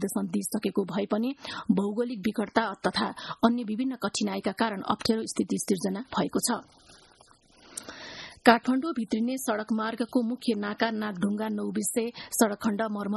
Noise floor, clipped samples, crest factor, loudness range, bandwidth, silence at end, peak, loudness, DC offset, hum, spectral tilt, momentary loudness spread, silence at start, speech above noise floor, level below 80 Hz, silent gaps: -59 dBFS; under 0.1%; 24 dB; 3 LU; 12.5 kHz; 0 s; -4 dBFS; -28 LUFS; under 0.1%; none; -4.5 dB/octave; 5 LU; 0 s; 31 dB; -64 dBFS; none